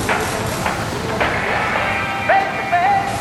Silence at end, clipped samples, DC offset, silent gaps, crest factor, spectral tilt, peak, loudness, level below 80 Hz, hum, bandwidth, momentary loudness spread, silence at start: 0 s; under 0.1%; under 0.1%; none; 14 dB; -4 dB/octave; -4 dBFS; -18 LUFS; -40 dBFS; none; 16 kHz; 5 LU; 0 s